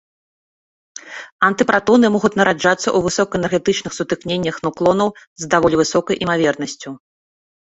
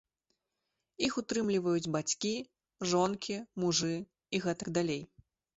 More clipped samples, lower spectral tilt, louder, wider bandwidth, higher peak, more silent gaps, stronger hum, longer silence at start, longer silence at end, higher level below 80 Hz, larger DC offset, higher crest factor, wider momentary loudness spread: neither; about the same, -4.5 dB/octave vs -4 dB/octave; first, -17 LUFS vs -33 LUFS; about the same, 8.2 kHz vs 8.2 kHz; first, -2 dBFS vs -16 dBFS; first, 1.32-1.39 s, 5.27-5.36 s vs none; neither; about the same, 0.95 s vs 1 s; first, 0.8 s vs 0.55 s; first, -50 dBFS vs -68 dBFS; neither; about the same, 16 dB vs 18 dB; first, 18 LU vs 8 LU